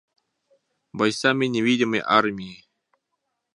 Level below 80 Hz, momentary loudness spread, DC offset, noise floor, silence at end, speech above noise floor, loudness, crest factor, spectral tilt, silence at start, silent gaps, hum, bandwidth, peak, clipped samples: -66 dBFS; 17 LU; under 0.1%; -78 dBFS; 1 s; 57 dB; -21 LUFS; 24 dB; -4.5 dB/octave; 0.95 s; none; none; 11.5 kHz; -2 dBFS; under 0.1%